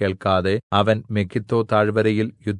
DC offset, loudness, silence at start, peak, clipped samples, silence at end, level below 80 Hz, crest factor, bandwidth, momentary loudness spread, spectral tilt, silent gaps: under 0.1%; -20 LUFS; 0 s; -4 dBFS; under 0.1%; 0 s; -60 dBFS; 18 dB; 10.5 kHz; 5 LU; -7.5 dB/octave; 0.63-0.70 s